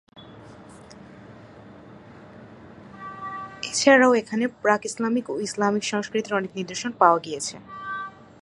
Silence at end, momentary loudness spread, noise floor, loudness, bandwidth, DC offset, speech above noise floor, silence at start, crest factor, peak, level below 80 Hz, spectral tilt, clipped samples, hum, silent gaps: 0.3 s; 20 LU; -45 dBFS; -23 LUFS; 11.5 kHz; under 0.1%; 23 dB; 0.15 s; 24 dB; -2 dBFS; -64 dBFS; -3.5 dB/octave; under 0.1%; none; none